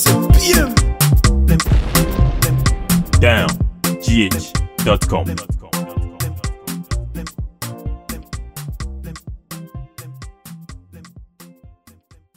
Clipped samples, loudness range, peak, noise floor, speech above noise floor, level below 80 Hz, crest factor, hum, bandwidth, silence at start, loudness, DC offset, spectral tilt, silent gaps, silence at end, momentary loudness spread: under 0.1%; 19 LU; 0 dBFS; -49 dBFS; 33 dB; -22 dBFS; 18 dB; none; 16.5 kHz; 0 s; -17 LUFS; under 0.1%; -5 dB/octave; none; 0.7 s; 21 LU